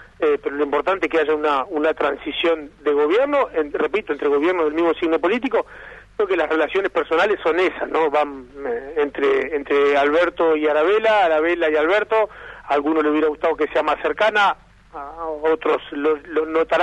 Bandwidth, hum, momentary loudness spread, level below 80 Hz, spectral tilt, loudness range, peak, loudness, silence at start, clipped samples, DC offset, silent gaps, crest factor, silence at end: 8.6 kHz; none; 8 LU; -52 dBFS; -5 dB/octave; 3 LU; -6 dBFS; -19 LUFS; 0 s; under 0.1%; under 0.1%; none; 14 dB; 0 s